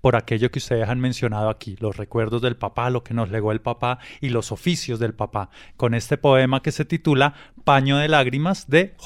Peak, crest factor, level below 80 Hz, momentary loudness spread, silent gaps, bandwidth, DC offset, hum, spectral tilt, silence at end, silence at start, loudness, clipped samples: -4 dBFS; 18 dB; -46 dBFS; 9 LU; none; 13.5 kHz; under 0.1%; none; -6 dB/octave; 0 s; 0.05 s; -22 LUFS; under 0.1%